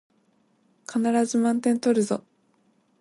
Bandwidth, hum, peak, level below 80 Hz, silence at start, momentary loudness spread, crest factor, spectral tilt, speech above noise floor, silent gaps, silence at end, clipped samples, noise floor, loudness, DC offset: 11.5 kHz; none; -10 dBFS; -74 dBFS; 0.9 s; 9 LU; 16 dB; -5 dB/octave; 43 dB; none; 0.8 s; under 0.1%; -66 dBFS; -24 LUFS; under 0.1%